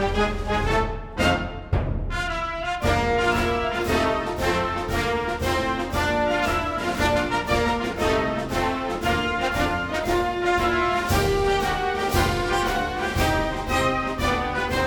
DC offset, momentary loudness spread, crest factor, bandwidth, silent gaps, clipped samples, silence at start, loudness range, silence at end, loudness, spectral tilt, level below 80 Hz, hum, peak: under 0.1%; 4 LU; 16 dB; 19 kHz; none; under 0.1%; 0 s; 1 LU; 0 s; -23 LUFS; -5 dB/octave; -34 dBFS; none; -6 dBFS